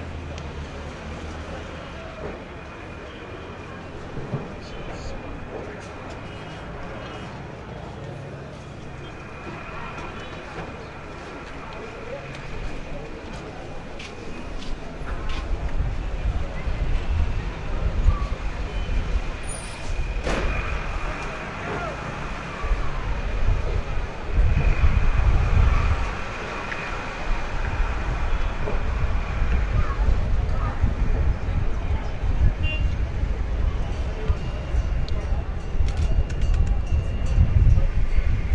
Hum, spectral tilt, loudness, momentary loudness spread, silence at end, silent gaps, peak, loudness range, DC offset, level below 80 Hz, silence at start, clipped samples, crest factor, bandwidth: none; -6.5 dB/octave; -28 LUFS; 13 LU; 0 s; none; -4 dBFS; 11 LU; under 0.1%; -26 dBFS; 0 s; under 0.1%; 18 dB; 10 kHz